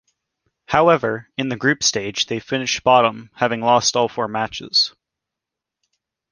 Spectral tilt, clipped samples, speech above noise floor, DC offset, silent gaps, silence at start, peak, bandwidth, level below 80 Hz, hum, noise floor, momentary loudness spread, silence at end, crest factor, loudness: -3 dB/octave; under 0.1%; 66 dB; under 0.1%; none; 0.7 s; -2 dBFS; 10.5 kHz; -56 dBFS; none; -85 dBFS; 8 LU; 1.4 s; 20 dB; -18 LUFS